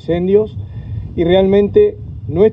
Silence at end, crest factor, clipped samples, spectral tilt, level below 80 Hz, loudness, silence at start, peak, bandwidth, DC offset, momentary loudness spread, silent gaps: 0 s; 14 dB; under 0.1%; -10 dB/octave; -34 dBFS; -14 LUFS; 0.05 s; 0 dBFS; 4.1 kHz; under 0.1%; 15 LU; none